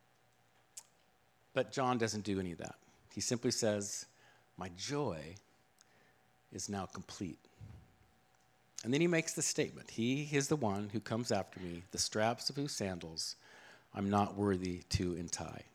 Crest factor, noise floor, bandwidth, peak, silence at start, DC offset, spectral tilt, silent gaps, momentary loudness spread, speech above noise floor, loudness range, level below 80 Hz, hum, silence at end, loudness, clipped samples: 22 dB; -72 dBFS; 16.5 kHz; -16 dBFS; 0.75 s; under 0.1%; -4 dB/octave; none; 18 LU; 35 dB; 9 LU; -64 dBFS; none; 0.1 s; -37 LUFS; under 0.1%